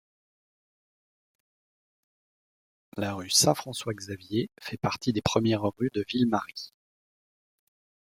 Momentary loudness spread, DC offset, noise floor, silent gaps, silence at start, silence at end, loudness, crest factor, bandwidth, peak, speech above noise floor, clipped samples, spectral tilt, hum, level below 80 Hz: 15 LU; under 0.1%; under -90 dBFS; none; 2.95 s; 1.5 s; -28 LUFS; 24 dB; 16.5 kHz; -8 dBFS; over 62 dB; under 0.1%; -4 dB/octave; none; -62 dBFS